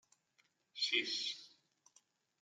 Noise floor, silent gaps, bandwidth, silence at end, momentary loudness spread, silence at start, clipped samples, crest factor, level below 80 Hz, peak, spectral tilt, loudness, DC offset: -78 dBFS; none; 12 kHz; 0.95 s; 16 LU; 0.75 s; under 0.1%; 24 dB; under -90 dBFS; -20 dBFS; 0.5 dB/octave; -37 LUFS; under 0.1%